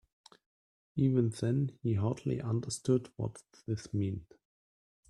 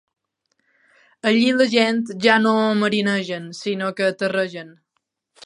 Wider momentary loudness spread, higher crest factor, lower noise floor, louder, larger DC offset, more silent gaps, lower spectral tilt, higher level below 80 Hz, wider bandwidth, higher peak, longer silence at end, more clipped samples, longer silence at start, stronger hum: about the same, 11 LU vs 11 LU; about the same, 18 dB vs 20 dB; first, under -90 dBFS vs -75 dBFS; second, -34 LUFS vs -19 LUFS; neither; neither; first, -7.5 dB/octave vs -5 dB/octave; first, -64 dBFS vs -72 dBFS; about the same, 12 kHz vs 11 kHz; second, -16 dBFS vs 0 dBFS; about the same, 0.85 s vs 0.75 s; neither; second, 0.95 s vs 1.25 s; neither